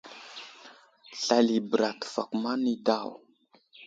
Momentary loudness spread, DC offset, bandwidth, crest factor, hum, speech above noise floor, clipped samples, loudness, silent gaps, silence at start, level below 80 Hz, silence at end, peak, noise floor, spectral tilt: 19 LU; under 0.1%; 7.8 kHz; 22 dB; none; 37 dB; under 0.1%; -28 LUFS; none; 0.05 s; -76 dBFS; 0 s; -8 dBFS; -64 dBFS; -4 dB/octave